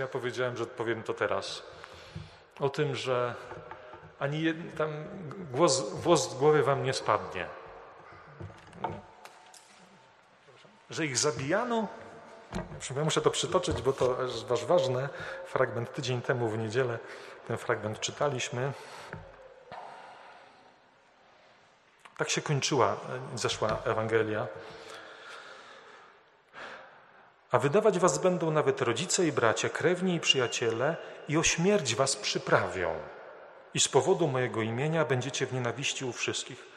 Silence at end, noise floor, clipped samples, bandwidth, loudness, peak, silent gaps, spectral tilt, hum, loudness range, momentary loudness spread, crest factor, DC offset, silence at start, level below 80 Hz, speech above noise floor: 0 s; -62 dBFS; under 0.1%; 13 kHz; -30 LUFS; -6 dBFS; none; -4 dB/octave; none; 10 LU; 21 LU; 24 dB; under 0.1%; 0 s; -62 dBFS; 32 dB